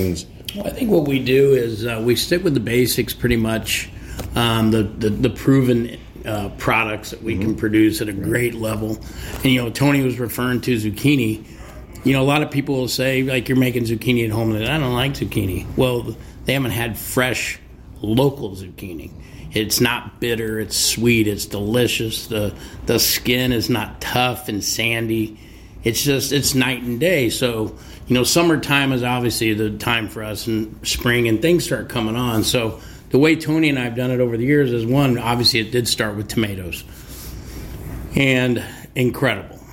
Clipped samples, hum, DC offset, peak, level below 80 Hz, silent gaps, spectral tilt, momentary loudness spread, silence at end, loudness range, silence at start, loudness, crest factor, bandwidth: under 0.1%; none; under 0.1%; -4 dBFS; -40 dBFS; none; -4.5 dB/octave; 13 LU; 0 s; 3 LU; 0 s; -19 LUFS; 16 dB; 17 kHz